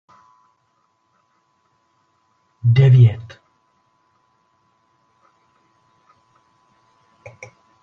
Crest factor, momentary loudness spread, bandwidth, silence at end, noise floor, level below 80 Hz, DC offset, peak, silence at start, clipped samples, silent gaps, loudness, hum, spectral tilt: 20 dB; 31 LU; 5.8 kHz; 4.6 s; -66 dBFS; -54 dBFS; under 0.1%; -2 dBFS; 2.65 s; under 0.1%; none; -14 LUFS; none; -9 dB/octave